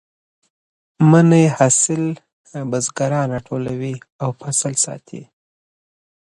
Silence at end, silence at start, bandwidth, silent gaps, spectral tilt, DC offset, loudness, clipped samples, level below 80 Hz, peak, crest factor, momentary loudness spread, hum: 1 s; 1 s; 11.5 kHz; 2.33-2.44 s, 4.12-4.19 s; -5.5 dB/octave; under 0.1%; -17 LUFS; under 0.1%; -58 dBFS; 0 dBFS; 18 dB; 20 LU; none